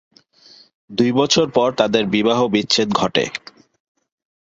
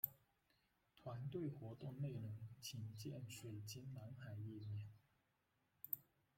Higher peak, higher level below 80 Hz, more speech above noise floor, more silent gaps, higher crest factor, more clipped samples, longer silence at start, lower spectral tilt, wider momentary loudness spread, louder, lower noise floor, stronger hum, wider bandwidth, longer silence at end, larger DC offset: first, -2 dBFS vs -24 dBFS; first, -56 dBFS vs -80 dBFS; about the same, 32 dB vs 34 dB; neither; second, 18 dB vs 28 dB; neither; first, 0.9 s vs 0.05 s; second, -4 dB/octave vs -6 dB/octave; about the same, 7 LU vs 7 LU; first, -17 LUFS vs -52 LUFS; second, -49 dBFS vs -85 dBFS; neither; second, 8 kHz vs 16.5 kHz; first, 1.05 s vs 0.35 s; neither